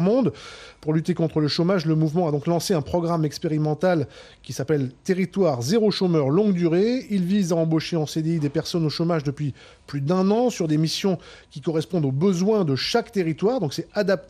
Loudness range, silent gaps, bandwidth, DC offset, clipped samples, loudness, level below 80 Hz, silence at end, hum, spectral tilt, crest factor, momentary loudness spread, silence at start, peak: 3 LU; none; 14.5 kHz; under 0.1%; under 0.1%; -23 LUFS; -56 dBFS; 0.05 s; none; -6.5 dB/octave; 14 dB; 9 LU; 0 s; -8 dBFS